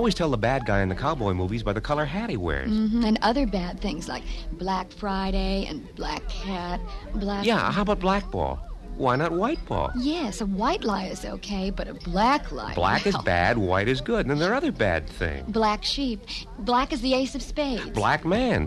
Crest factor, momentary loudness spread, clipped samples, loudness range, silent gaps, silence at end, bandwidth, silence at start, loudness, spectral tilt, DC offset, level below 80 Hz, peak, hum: 18 dB; 10 LU; under 0.1%; 4 LU; none; 0 s; 12.5 kHz; 0 s; -26 LUFS; -5.5 dB/octave; under 0.1%; -36 dBFS; -8 dBFS; none